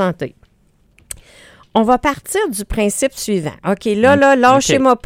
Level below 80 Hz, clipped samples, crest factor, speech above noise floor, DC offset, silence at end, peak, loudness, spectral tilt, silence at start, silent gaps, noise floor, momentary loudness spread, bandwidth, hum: -40 dBFS; under 0.1%; 16 dB; 41 dB; under 0.1%; 0.1 s; 0 dBFS; -15 LUFS; -4.5 dB/octave; 0 s; none; -55 dBFS; 19 LU; 16.5 kHz; none